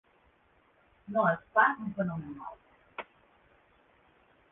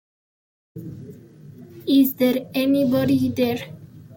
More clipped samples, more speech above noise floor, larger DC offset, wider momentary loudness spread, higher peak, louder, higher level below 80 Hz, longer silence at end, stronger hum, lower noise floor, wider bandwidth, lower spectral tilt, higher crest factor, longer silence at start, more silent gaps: neither; first, 37 dB vs 24 dB; neither; about the same, 21 LU vs 20 LU; about the same, -10 dBFS vs -8 dBFS; second, -30 LUFS vs -20 LUFS; second, -70 dBFS vs -60 dBFS; first, 1.5 s vs 0 s; neither; first, -67 dBFS vs -43 dBFS; second, 3.9 kHz vs 17 kHz; second, -5 dB/octave vs -6.5 dB/octave; first, 24 dB vs 16 dB; first, 1.1 s vs 0.75 s; neither